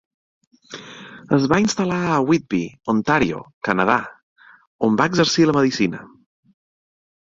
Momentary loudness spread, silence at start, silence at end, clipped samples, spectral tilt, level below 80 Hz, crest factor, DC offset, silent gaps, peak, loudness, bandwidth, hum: 20 LU; 0.7 s; 1.25 s; under 0.1%; -5 dB/octave; -52 dBFS; 20 dB; under 0.1%; 3.53-3.61 s, 4.23-4.36 s, 4.67-4.79 s; 0 dBFS; -19 LUFS; 7.8 kHz; none